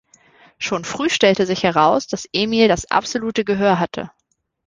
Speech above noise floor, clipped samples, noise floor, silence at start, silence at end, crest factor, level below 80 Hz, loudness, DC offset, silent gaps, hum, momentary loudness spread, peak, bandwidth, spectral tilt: 34 dB; under 0.1%; -51 dBFS; 0.6 s; 0.6 s; 18 dB; -50 dBFS; -18 LUFS; under 0.1%; none; none; 9 LU; -2 dBFS; 10 kHz; -4.5 dB/octave